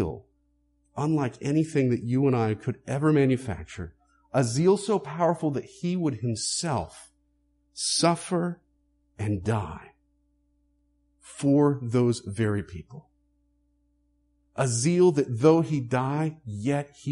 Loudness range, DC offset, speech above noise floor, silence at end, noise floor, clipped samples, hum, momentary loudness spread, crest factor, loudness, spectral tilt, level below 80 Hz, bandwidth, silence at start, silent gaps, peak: 4 LU; under 0.1%; 44 dB; 0 s; -69 dBFS; under 0.1%; none; 17 LU; 18 dB; -26 LUFS; -6 dB/octave; -56 dBFS; 11.5 kHz; 0 s; none; -8 dBFS